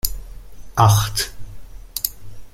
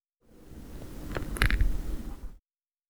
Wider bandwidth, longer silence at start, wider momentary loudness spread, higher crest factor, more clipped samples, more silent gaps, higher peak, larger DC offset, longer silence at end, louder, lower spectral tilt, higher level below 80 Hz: second, 17 kHz vs over 20 kHz; second, 0.05 s vs 0.35 s; second, 14 LU vs 22 LU; second, 22 dB vs 28 dB; neither; neither; first, 0 dBFS vs -4 dBFS; neither; second, 0.05 s vs 0.5 s; first, -20 LUFS vs -33 LUFS; second, -3.5 dB/octave vs -5 dB/octave; about the same, -36 dBFS vs -34 dBFS